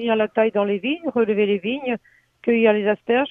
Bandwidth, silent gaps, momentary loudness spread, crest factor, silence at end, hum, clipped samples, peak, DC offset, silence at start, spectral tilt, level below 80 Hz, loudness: 3.8 kHz; none; 9 LU; 16 dB; 0 s; none; under 0.1%; -4 dBFS; under 0.1%; 0 s; -8.5 dB/octave; -64 dBFS; -21 LUFS